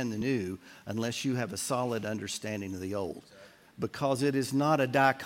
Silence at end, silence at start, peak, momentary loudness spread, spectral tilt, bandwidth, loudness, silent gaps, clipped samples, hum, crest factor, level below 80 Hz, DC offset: 0 s; 0 s; -10 dBFS; 12 LU; -5 dB/octave; 16.5 kHz; -31 LUFS; none; under 0.1%; none; 20 dB; -68 dBFS; under 0.1%